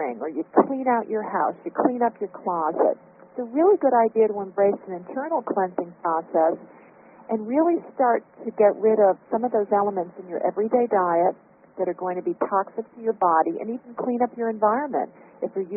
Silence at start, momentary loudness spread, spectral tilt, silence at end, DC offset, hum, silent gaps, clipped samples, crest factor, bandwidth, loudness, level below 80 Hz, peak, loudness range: 0 s; 11 LU; -1.5 dB/octave; 0 s; under 0.1%; none; none; under 0.1%; 22 dB; 3 kHz; -23 LUFS; -72 dBFS; -2 dBFS; 3 LU